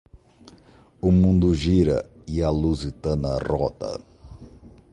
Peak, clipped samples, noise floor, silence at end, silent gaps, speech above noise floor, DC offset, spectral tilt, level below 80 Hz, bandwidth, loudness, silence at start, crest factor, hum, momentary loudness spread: -6 dBFS; under 0.1%; -52 dBFS; 0.25 s; none; 31 dB; under 0.1%; -8 dB/octave; -34 dBFS; 9.4 kHz; -23 LUFS; 0.15 s; 16 dB; none; 12 LU